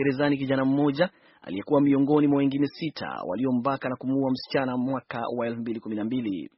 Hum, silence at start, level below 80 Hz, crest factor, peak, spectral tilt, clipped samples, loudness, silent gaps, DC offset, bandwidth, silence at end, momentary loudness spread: none; 0 s; -66 dBFS; 18 dB; -8 dBFS; -6 dB/octave; under 0.1%; -26 LUFS; none; under 0.1%; 5.8 kHz; 0.15 s; 10 LU